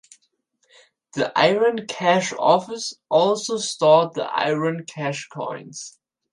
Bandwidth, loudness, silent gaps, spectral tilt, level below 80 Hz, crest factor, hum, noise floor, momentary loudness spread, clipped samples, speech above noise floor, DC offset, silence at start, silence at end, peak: 11.5 kHz; -21 LUFS; none; -4 dB/octave; -70 dBFS; 20 dB; none; -68 dBFS; 14 LU; under 0.1%; 48 dB; under 0.1%; 1.15 s; 0.45 s; -2 dBFS